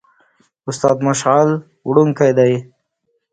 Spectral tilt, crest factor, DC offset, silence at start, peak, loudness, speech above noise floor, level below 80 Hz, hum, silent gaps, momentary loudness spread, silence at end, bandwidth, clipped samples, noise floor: -6 dB/octave; 16 dB; under 0.1%; 0.65 s; 0 dBFS; -15 LUFS; 55 dB; -58 dBFS; none; none; 10 LU; 0.7 s; 9.4 kHz; under 0.1%; -69 dBFS